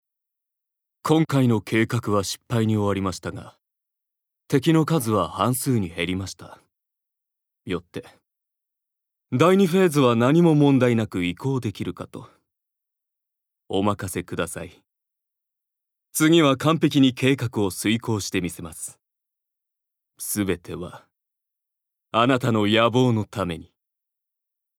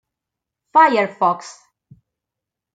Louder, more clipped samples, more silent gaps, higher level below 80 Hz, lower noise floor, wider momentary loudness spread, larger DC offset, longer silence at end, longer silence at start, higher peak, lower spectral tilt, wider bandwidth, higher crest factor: second, -22 LUFS vs -16 LUFS; neither; neither; first, -58 dBFS vs -74 dBFS; about the same, -84 dBFS vs -84 dBFS; first, 18 LU vs 7 LU; neither; about the same, 1.15 s vs 1.25 s; first, 1.05 s vs 0.75 s; about the same, -2 dBFS vs -2 dBFS; about the same, -5.5 dB/octave vs -4.5 dB/octave; first, 18 kHz vs 9.2 kHz; about the same, 20 dB vs 18 dB